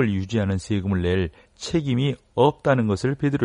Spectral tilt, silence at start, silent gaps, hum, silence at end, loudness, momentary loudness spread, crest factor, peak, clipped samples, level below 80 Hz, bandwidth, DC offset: -7 dB/octave; 0 s; none; none; 0 s; -23 LUFS; 5 LU; 18 dB; -4 dBFS; under 0.1%; -46 dBFS; 10.5 kHz; under 0.1%